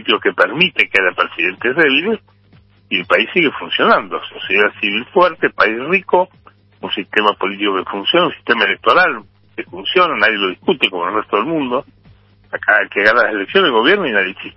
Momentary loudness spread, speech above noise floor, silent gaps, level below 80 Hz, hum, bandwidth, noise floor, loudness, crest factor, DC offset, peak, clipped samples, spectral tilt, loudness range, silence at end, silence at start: 11 LU; 34 dB; none; -56 dBFS; none; 11 kHz; -49 dBFS; -14 LUFS; 16 dB; under 0.1%; 0 dBFS; under 0.1%; -5.5 dB/octave; 2 LU; 0.05 s; 0 s